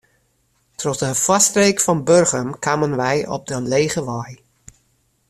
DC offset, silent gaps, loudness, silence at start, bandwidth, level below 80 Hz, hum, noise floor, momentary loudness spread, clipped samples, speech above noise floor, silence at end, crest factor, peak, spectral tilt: under 0.1%; none; -18 LUFS; 0.8 s; 15.5 kHz; -54 dBFS; none; -64 dBFS; 13 LU; under 0.1%; 46 dB; 0.95 s; 18 dB; 0 dBFS; -3.5 dB/octave